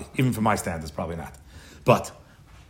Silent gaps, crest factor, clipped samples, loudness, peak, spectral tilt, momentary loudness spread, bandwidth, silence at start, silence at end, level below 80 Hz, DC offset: none; 22 dB; under 0.1%; -25 LUFS; -4 dBFS; -6 dB/octave; 15 LU; 16 kHz; 0 s; 0.1 s; -50 dBFS; under 0.1%